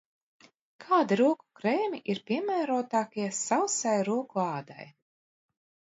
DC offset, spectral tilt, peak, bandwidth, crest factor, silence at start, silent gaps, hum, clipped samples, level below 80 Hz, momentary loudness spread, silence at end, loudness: under 0.1%; -4.5 dB/octave; -12 dBFS; 8 kHz; 18 dB; 0.8 s; none; none; under 0.1%; -80 dBFS; 8 LU; 1.05 s; -29 LUFS